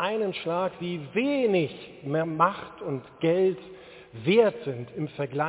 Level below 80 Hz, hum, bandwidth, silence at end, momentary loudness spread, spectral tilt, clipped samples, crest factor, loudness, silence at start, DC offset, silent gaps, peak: -66 dBFS; none; 4 kHz; 0 s; 14 LU; -10.5 dB/octave; under 0.1%; 20 dB; -27 LUFS; 0 s; under 0.1%; none; -8 dBFS